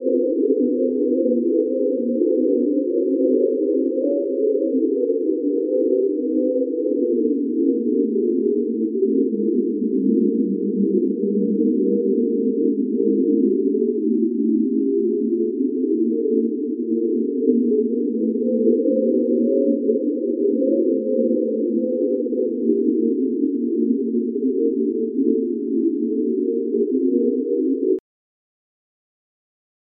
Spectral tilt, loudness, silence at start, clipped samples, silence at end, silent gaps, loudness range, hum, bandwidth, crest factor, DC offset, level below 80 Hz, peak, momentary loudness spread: -14 dB/octave; -20 LUFS; 0 s; under 0.1%; 2 s; none; 2 LU; none; 0.7 kHz; 16 dB; under 0.1%; -86 dBFS; -4 dBFS; 3 LU